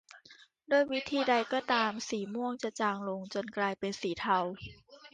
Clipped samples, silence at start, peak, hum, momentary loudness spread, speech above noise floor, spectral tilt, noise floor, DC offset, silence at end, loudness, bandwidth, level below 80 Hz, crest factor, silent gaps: under 0.1%; 0.15 s; -16 dBFS; none; 8 LU; 27 dB; -4 dB/octave; -59 dBFS; under 0.1%; 0.05 s; -32 LUFS; 9.8 kHz; -68 dBFS; 18 dB; none